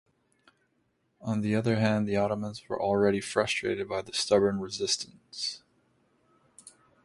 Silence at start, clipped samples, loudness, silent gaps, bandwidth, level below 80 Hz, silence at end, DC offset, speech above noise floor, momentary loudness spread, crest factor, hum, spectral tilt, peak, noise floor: 1.2 s; under 0.1%; -29 LUFS; none; 11.5 kHz; -62 dBFS; 0.35 s; under 0.1%; 45 dB; 9 LU; 20 dB; none; -4.5 dB/octave; -10 dBFS; -74 dBFS